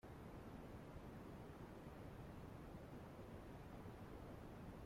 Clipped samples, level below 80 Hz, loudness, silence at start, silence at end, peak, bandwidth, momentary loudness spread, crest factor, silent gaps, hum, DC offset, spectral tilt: under 0.1%; -64 dBFS; -57 LUFS; 0.05 s; 0 s; -44 dBFS; 16.5 kHz; 1 LU; 12 dB; none; none; under 0.1%; -7 dB/octave